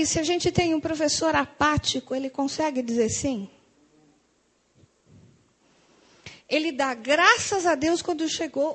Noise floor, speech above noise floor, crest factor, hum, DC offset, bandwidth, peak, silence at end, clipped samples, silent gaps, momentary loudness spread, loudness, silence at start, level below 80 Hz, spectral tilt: -67 dBFS; 43 dB; 22 dB; none; under 0.1%; 9.2 kHz; -4 dBFS; 0 s; under 0.1%; none; 10 LU; -24 LUFS; 0 s; -50 dBFS; -3 dB/octave